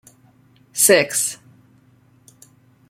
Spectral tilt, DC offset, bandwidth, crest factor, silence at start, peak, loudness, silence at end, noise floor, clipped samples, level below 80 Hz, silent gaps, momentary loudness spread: -1.5 dB/octave; under 0.1%; 16.5 kHz; 22 dB; 0.75 s; 0 dBFS; -16 LUFS; 1.55 s; -54 dBFS; under 0.1%; -68 dBFS; none; 18 LU